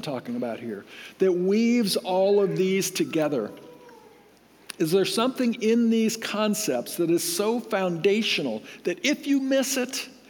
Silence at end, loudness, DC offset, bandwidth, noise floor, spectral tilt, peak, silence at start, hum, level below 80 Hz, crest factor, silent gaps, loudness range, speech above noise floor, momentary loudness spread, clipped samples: 0.15 s; -24 LUFS; under 0.1%; 19.5 kHz; -55 dBFS; -4 dB/octave; -8 dBFS; 0 s; none; -76 dBFS; 16 dB; none; 2 LU; 31 dB; 10 LU; under 0.1%